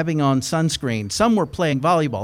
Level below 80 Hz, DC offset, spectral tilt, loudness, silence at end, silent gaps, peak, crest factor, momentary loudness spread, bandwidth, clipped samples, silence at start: -48 dBFS; under 0.1%; -5.5 dB/octave; -20 LUFS; 0 s; none; -4 dBFS; 14 dB; 4 LU; 16 kHz; under 0.1%; 0 s